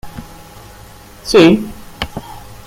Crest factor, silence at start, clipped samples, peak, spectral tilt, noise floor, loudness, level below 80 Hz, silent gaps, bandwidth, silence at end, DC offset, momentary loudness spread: 16 dB; 0.05 s; under 0.1%; 0 dBFS; -5.5 dB/octave; -38 dBFS; -13 LUFS; -38 dBFS; none; 16.5 kHz; 0.15 s; under 0.1%; 25 LU